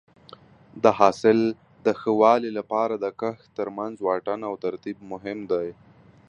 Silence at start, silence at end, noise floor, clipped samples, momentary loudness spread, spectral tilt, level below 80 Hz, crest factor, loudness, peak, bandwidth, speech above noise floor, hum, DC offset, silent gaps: 0.75 s; 0.55 s; -50 dBFS; under 0.1%; 15 LU; -6.5 dB/octave; -66 dBFS; 22 dB; -24 LUFS; -2 dBFS; 8.2 kHz; 26 dB; none; under 0.1%; none